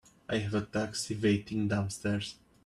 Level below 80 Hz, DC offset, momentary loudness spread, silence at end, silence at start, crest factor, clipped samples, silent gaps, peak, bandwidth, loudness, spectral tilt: -60 dBFS; under 0.1%; 6 LU; 0.35 s; 0.3 s; 16 dB; under 0.1%; none; -16 dBFS; 13 kHz; -33 LUFS; -5.5 dB/octave